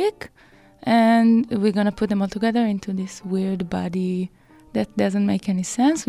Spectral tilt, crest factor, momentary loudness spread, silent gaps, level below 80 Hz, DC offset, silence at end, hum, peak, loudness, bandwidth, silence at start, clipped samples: -6 dB/octave; 14 dB; 12 LU; none; -54 dBFS; under 0.1%; 0.05 s; none; -6 dBFS; -21 LUFS; 12.5 kHz; 0 s; under 0.1%